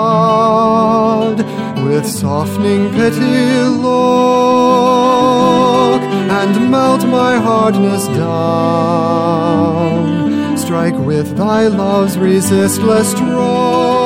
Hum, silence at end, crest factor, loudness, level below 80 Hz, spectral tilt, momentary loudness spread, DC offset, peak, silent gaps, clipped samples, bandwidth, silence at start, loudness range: none; 0 s; 10 dB; -12 LUFS; -50 dBFS; -6 dB/octave; 5 LU; under 0.1%; 0 dBFS; none; under 0.1%; 16.5 kHz; 0 s; 3 LU